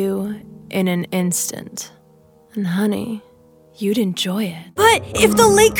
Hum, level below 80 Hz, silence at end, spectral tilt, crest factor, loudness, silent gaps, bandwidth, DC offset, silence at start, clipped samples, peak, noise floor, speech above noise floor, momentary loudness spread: none; -48 dBFS; 0 s; -4 dB/octave; 18 dB; -18 LUFS; none; 20 kHz; under 0.1%; 0 s; under 0.1%; 0 dBFS; -51 dBFS; 34 dB; 18 LU